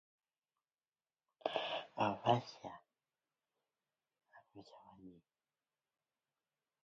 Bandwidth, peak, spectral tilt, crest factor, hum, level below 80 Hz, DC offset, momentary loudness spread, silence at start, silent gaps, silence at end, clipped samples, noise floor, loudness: 7.6 kHz; -18 dBFS; -3.5 dB/octave; 28 dB; none; -84 dBFS; under 0.1%; 25 LU; 1.45 s; none; 1.7 s; under 0.1%; under -90 dBFS; -39 LUFS